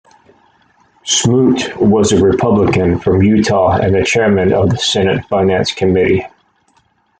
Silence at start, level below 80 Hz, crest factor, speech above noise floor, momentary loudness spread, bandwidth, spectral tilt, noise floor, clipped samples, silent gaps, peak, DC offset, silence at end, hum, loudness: 1.05 s; -42 dBFS; 12 dB; 45 dB; 4 LU; 9.4 kHz; -5 dB/octave; -56 dBFS; under 0.1%; none; 0 dBFS; under 0.1%; 0.95 s; none; -12 LUFS